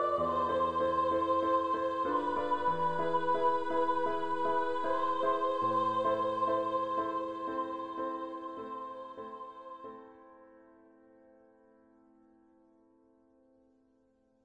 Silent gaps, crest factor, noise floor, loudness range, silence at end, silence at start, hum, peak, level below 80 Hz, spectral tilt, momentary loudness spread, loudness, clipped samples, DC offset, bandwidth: none; 16 dB; -70 dBFS; 16 LU; 0 s; 0 s; none; -18 dBFS; -66 dBFS; -6.5 dB/octave; 15 LU; -32 LUFS; under 0.1%; under 0.1%; 9.4 kHz